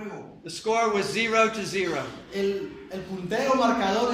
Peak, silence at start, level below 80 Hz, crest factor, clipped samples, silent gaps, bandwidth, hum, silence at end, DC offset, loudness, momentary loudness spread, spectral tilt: -8 dBFS; 0 s; -58 dBFS; 20 dB; under 0.1%; none; 16 kHz; none; 0 s; under 0.1%; -25 LUFS; 15 LU; -4 dB/octave